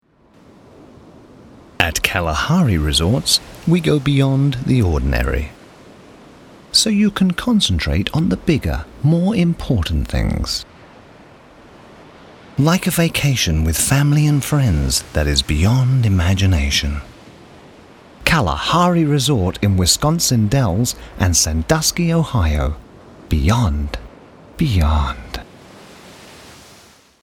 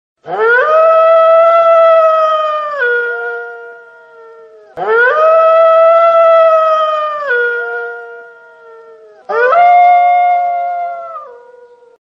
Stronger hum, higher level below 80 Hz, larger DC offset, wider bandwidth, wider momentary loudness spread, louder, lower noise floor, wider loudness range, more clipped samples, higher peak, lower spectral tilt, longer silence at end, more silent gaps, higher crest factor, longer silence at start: neither; first, -28 dBFS vs -70 dBFS; neither; first, 18.5 kHz vs 6 kHz; second, 8 LU vs 15 LU; second, -17 LUFS vs -9 LUFS; first, -49 dBFS vs -40 dBFS; about the same, 5 LU vs 5 LU; neither; about the same, 0 dBFS vs 0 dBFS; first, -4.5 dB/octave vs -3 dB/octave; about the same, 0.7 s vs 0.7 s; neither; first, 18 dB vs 10 dB; first, 1.8 s vs 0.25 s